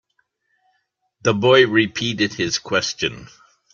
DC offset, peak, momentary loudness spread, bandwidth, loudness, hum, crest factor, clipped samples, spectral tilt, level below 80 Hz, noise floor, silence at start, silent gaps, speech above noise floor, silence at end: under 0.1%; -2 dBFS; 11 LU; 7.4 kHz; -18 LUFS; none; 18 dB; under 0.1%; -4 dB/octave; -56 dBFS; -70 dBFS; 1.25 s; none; 51 dB; 0.45 s